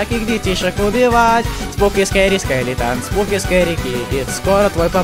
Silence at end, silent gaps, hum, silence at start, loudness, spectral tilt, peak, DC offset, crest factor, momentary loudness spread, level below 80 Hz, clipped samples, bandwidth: 0 s; none; none; 0 s; -16 LUFS; -4.5 dB/octave; 0 dBFS; under 0.1%; 14 dB; 7 LU; -28 dBFS; under 0.1%; 16.5 kHz